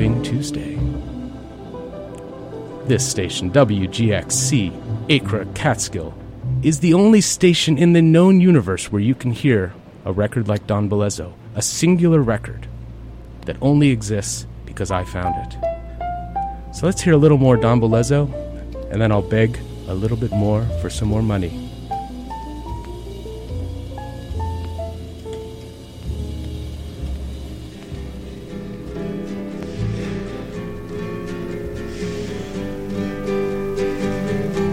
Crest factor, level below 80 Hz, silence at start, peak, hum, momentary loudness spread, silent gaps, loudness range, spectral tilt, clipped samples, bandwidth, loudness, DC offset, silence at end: 18 dB; -34 dBFS; 0 s; -2 dBFS; none; 19 LU; none; 15 LU; -5.5 dB/octave; under 0.1%; 16 kHz; -19 LUFS; under 0.1%; 0 s